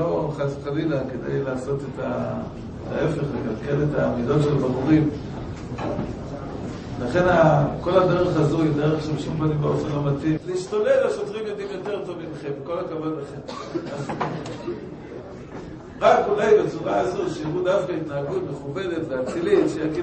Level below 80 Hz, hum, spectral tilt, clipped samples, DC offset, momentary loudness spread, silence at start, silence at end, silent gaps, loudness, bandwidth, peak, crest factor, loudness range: -46 dBFS; none; -7.5 dB/octave; under 0.1%; under 0.1%; 14 LU; 0 s; 0 s; none; -23 LUFS; 8.8 kHz; -4 dBFS; 20 dB; 9 LU